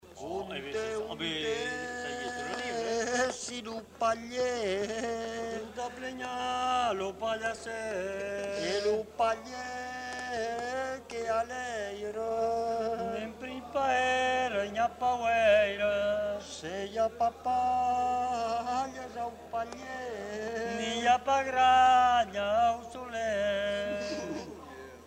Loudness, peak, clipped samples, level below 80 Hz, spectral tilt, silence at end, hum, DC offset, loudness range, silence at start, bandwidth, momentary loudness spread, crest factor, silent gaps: -31 LUFS; -14 dBFS; under 0.1%; -58 dBFS; -3 dB/octave; 0 s; none; under 0.1%; 7 LU; 0.05 s; 15.5 kHz; 12 LU; 18 dB; none